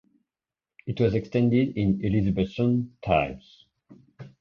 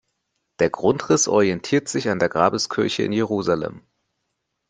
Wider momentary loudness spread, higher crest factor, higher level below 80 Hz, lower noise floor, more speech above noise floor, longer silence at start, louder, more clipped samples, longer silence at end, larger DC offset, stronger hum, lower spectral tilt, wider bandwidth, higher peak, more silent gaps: first, 11 LU vs 6 LU; about the same, 18 dB vs 20 dB; first, -46 dBFS vs -60 dBFS; first, under -90 dBFS vs -76 dBFS; first, over 66 dB vs 56 dB; first, 0.85 s vs 0.6 s; second, -25 LUFS vs -21 LUFS; neither; second, 0.15 s vs 0.9 s; neither; neither; first, -9 dB/octave vs -4 dB/octave; second, 6.8 kHz vs 10 kHz; second, -8 dBFS vs -2 dBFS; neither